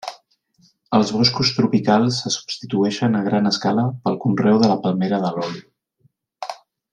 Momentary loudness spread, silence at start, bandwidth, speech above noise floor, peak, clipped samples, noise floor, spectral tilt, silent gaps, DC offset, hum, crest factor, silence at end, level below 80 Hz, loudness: 15 LU; 0.05 s; 9.8 kHz; 44 dB; -2 dBFS; under 0.1%; -63 dBFS; -5.5 dB/octave; none; under 0.1%; none; 18 dB; 0.4 s; -60 dBFS; -19 LUFS